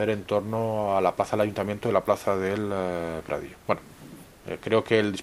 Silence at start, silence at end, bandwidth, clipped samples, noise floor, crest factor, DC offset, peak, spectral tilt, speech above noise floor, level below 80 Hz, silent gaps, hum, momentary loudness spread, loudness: 0 s; 0 s; 15.5 kHz; under 0.1%; -47 dBFS; 20 dB; under 0.1%; -6 dBFS; -6 dB/octave; 20 dB; -56 dBFS; none; none; 12 LU; -27 LUFS